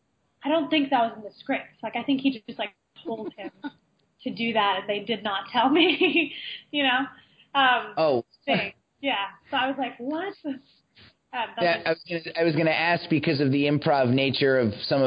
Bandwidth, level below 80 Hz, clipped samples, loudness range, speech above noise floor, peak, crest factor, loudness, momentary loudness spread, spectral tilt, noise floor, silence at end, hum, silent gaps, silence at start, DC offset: 5.2 kHz; -66 dBFS; under 0.1%; 6 LU; 32 dB; -8 dBFS; 18 dB; -25 LUFS; 14 LU; -9 dB/octave; -57 dBFS; 0 s; none; none; 0.45 s; under 0.1%